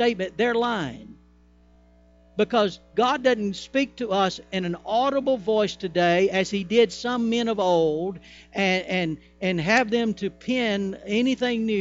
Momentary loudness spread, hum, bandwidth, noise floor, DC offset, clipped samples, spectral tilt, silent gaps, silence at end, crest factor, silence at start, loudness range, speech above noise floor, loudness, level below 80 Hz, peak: 8 LU; 60 Hz at -50 dBFS; 8 kHz; -55 dBFS; under 0.1%; under 0.1%; -5 dB/octave; none; 0 s; 18 dB; 0 s; 3 LU; 32 dB; -24 LUFS; -56 dBFS; -6 dBFS